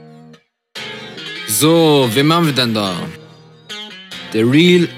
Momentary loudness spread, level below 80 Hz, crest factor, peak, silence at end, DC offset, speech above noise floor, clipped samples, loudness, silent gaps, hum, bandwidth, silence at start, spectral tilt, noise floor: 19 LU; -62 dBFS; 16 dB; 0 dBFS; 0 s; under 0.1%; 33 dB; under 0.1%; -13 LUFS; none; none; 16.5 kHz; 0.75 s; -4.5 dB/octave; -46 dBFS